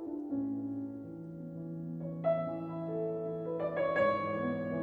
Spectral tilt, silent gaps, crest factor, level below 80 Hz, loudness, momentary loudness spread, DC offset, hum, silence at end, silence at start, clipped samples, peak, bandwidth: -9.5 dB/octave; none; 16 dB; -70 dBFS; -36 LUFS; 13 LU; under 0.1%; none; 0 s; 0 s; under 0.1%; -18 dBFS; 4.8 kHz